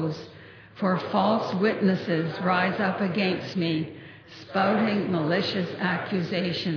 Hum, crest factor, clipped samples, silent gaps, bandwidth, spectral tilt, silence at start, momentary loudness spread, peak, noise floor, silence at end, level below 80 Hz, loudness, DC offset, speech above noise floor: none; 16 dB; under 0.1%; none; 5.4 kHz; -7.5 dB/octave; 0 s; 8 LU; -10 dBFS; -47 dBFS; 0 s; -68 dBFS; -26 LUFS; under 0.1%; 22 dB